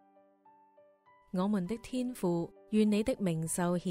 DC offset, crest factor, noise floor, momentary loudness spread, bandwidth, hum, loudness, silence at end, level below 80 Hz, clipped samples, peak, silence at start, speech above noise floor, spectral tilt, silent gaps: under 0.1%; 16 dB; -64 dBFS; 8 LU; 16 kHz; none; -33 LUFS; 0 s; -62 dBFS; under 0.1%; -16 dBFS; 1.35 s; 33 dB; -6 dB/octave; none